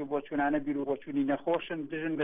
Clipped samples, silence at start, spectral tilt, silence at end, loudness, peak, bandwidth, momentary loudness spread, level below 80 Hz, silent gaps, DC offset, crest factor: under 0.1%; 0 s; -9 dB/octave; 0 s; -32 LUFS; -18 dBFS; 3.8 kHz; 5 LU; -64 dBFS; none; under 0.1%; 14 dB